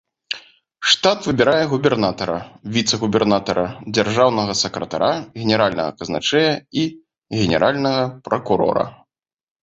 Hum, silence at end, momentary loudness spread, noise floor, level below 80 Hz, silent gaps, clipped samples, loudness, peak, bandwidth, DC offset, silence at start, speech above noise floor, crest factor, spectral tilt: none; 0.7 s; 9 LU; -63 dBFS; -50 dBFS; none; under 0.1%; -19 LUFS; -2 dBFS; 8.2 kHz; under 0.1%; 0.3 s; 45 dB; 18 dB; -4.5 dB/octave